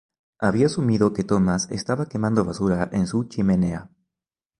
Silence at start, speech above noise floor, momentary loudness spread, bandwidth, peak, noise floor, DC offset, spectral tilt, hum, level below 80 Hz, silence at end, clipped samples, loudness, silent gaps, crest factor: 0.4 s; 67 dB; 5 LU; 11 kHz; -4 dBFS; -89 dBFS; under 0.1%; -6.5 dB/octave; none; -46 dBFS; 0.75 s; under 0.1%; -22 LUFS; none; 18 dB